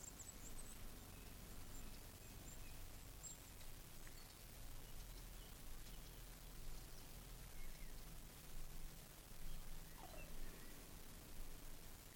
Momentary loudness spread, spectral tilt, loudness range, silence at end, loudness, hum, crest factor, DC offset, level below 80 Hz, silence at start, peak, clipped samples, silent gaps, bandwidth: 3 LU; -3 dB/octave; 1 LU; 0 s; -58 LUFS; none; 14 dB; under 0.1%; -56 dBFS; 0 s; -38 dBFS; under 0.1%; none; 17.5 kHz